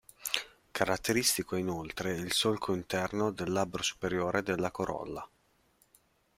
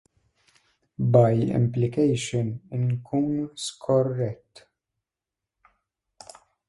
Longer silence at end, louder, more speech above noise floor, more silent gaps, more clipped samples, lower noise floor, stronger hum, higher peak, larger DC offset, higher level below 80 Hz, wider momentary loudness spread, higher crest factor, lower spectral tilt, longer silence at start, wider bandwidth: second, 1.1 s vs 2.35 s; second, -32 LUFS vs -24 LUFS; second, 37 dB vs 65 dB; neither; neither; second, -69 dBFS vs -88 dBFS; neither; second, -10 dBFS vs -4 dBFS; neither; about the same, -60 dBFS vs -58 dBFS; second, 8 LU vs 12 LU; about the same, 24 dB vs 22 dB; second, -3.5 dB/octave vs -7 dB/octave; second, 0.2 s vs 1 s; first, 16 kHz vs 11.5 kHz